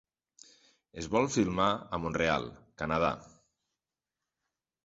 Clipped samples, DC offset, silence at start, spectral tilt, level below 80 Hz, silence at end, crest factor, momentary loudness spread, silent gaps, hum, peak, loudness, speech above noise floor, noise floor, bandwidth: under 0.1%; under 0.1%; 0.95 s; -5 dB/octave; -56 dBFS; 1.55 s; 22 dB; 15 LU; none; none; -12 dBFS; -31 LUFS; over 59 dB; under -90 dBFS; 8 kHz